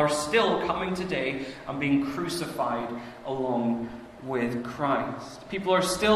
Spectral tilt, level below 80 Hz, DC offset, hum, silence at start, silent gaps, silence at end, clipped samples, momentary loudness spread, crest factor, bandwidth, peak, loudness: -4.5 dB/octave; -56 dBFS; under 0.1%; none; 0 s; none; 0 s; under 0.1%; 12 LU; 18 dB; 14 kHz; -8 dBFS; -28 LUFS